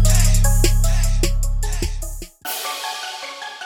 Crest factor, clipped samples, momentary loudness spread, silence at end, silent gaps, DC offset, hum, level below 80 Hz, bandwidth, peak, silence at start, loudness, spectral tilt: 14 dB; under 0.1%; 13 LU; 0 s; none; under 0.1%; none; -18 dBFS; 17.5 kHz; -4 dBFS; 0 s; -21 LUFS; -3.5 dB/octave